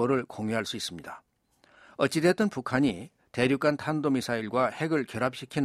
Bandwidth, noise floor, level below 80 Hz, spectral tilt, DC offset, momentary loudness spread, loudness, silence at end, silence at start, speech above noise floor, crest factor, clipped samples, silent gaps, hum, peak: 15.5 kHz; -65 dBFS; -64 dBFS; -5.5 dB/octave; under 0.1%; 14 LU; -28 LUFS; 0 s; 0 s; 37 dB; 20 dB; under 0.1%; none; none; -10 dBFS